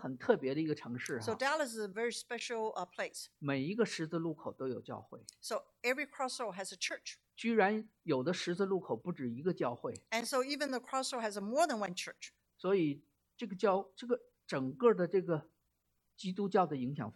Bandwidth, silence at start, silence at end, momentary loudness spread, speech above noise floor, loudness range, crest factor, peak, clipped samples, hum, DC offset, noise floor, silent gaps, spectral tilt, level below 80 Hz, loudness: 14 kHz; 0 s; 0.05 s; 10 LU; 45 dB; 4 LU; 20 dB; -16 dBFS; under 0.1%; none; under 0.1%; -81 dBFS; none; -4.5 dB/octave; -82 dBFS; -36 LUFS